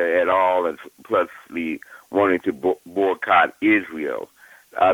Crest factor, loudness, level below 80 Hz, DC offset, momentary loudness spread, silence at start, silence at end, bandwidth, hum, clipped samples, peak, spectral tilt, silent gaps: 18 dB; -21 LUFS; -64 dBFS; under 0.1%; 14 LU; 0 s; 0 s; 18 kHz; none; under 0.1%; -4 dBFS; -6 dB/octave; none